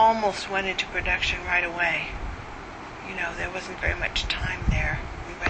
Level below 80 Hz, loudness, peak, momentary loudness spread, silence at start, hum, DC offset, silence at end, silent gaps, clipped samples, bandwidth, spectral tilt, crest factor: -36 dBFS; -26 LUFS; -8 dBFS; 13 LU; 0 s; none; under 0.1%; 0 s; none; under 0.1%; 8.8 kHz; -4 dB/octave; 20 dB